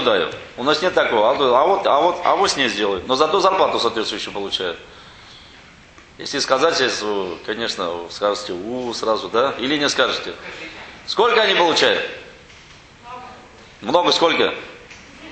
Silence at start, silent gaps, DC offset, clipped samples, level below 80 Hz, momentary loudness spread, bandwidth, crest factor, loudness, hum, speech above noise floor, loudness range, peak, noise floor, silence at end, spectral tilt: 0 s; none; under 0.1%; under 0.1%; -54 dBFS; 17 LU; 9 kHz; 20 dB; -18 LUFS; none; 27 dB; 6 LU; 0 dBFS; -45 dBFS; 0 s; -2.5 dB/octave